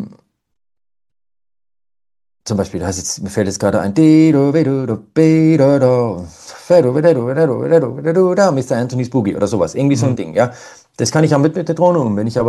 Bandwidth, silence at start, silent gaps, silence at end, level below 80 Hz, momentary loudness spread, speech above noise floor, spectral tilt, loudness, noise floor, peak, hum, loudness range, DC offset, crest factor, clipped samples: 12.5 kHz; 0 s; none; 0 s; -50 dBFS; 10 LU; 34 dB; -6.5 dB/octave; -14 LUFS; -48 dBFS; 0 dBFS; none; 8 LU; under 0.1%; 14 dB; under 0.1%